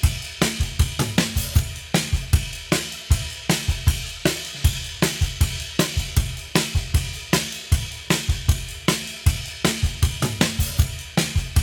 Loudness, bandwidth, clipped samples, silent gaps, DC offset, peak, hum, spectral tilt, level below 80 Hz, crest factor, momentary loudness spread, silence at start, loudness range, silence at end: -23 LUFS; 19 kHz; under 0.1%; none; under 0.1%; -2 dBFS; none; -4 dB/octave; -28 dBFS; 20 dB; 2 LU; 0 s; 1 LU; 0 s